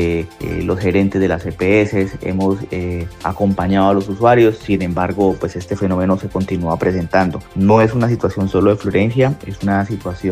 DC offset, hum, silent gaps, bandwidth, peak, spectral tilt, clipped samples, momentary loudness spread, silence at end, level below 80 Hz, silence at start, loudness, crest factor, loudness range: under 0.1%; none; none; 15 kHz; 0 dBFS; -8 dB/octave; under 0.1%; 9 LU; 0 s; -38 dBFS; 0 s; -16 LUFS; 16 dB; 2 LU